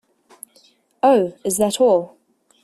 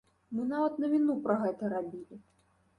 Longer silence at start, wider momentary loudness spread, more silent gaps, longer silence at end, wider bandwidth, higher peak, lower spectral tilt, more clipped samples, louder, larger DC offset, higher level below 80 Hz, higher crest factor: first, 1.05 s vs 0.3 s; second, 6 LU vs 14 LU; neither; about the same, 0.55 s vs 0.6 s; first, 14.5 kHz vs 9.8 kHz; first, -4 dBFS vs -16 dBFS; second, -4 dB/octave vs -8.5 dB/octave; neither; first, -18 LUFS vs -32 LUFS; neither; first, -62 dBFS vs -74 dBFS; about the same, 16 dB vs 16 dB